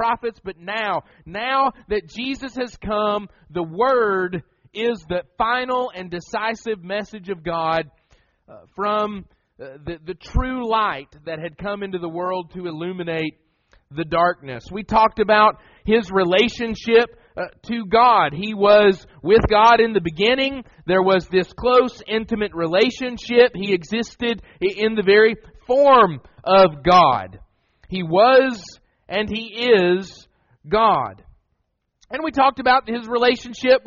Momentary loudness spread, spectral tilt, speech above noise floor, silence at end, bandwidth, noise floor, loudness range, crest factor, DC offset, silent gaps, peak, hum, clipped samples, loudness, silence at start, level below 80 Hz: 17 LU; -3 dB/octave; 52 dB; 0.1 s; 7.2 kHz; -71 dBFS; 10 LU; 18 dB; under 0.1%; none; -2 dBFS; none; under 0.1%; -19 LUFS; 0 s; -42 dBFS